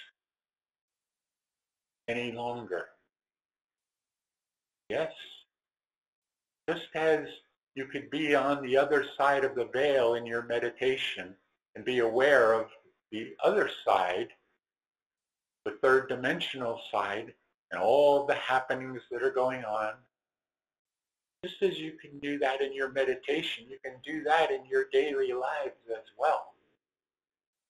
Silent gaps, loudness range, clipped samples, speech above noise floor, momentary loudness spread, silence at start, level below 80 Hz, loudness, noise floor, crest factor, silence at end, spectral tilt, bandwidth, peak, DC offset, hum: 0.81-0.88 s, 3.64-3.68 s, 5.98-6.02 s, 6.08-6.22 s, 11.69-11.73 s, 15.06-15.10 s, 17.54-17.68 s, 20.79-20.85 s; 12 LU; under 0.1%; over 61 dB; 16 LU; 0 s; -72 dBFS; -30 LUFS; under -90 dBFS; 22 dB; 1.2 s; -4.5 dB/octave; 13 kHz; -10 dBFS; under 0.1%; none